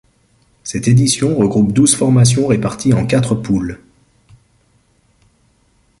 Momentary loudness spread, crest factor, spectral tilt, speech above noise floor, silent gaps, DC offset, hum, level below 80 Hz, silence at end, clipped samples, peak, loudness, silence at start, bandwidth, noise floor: 12 LU; 16 dB; -5.5 dB/octave; 44 dB; none; under 0.1%; none; -42 dBFS; 2.25 s; under 0.1%; 0 dBFS; -14 LUFS; 0.65 s; 11.5 kHz; -57 dBFS